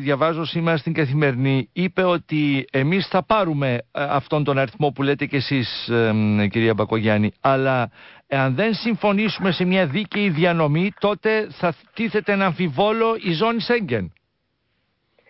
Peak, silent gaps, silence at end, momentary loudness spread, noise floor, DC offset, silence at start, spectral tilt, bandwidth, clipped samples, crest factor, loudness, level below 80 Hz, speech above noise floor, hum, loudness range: -6 dBFS; none; 1.2 s; 4 LU; -72 dBFS; under 0.1%; 0 s; -11 dB/octave; 5.8 kHz; under 0.1%; 14 dB; -21 LUFS; -54 dBFS; 51 dB; none; 1 LU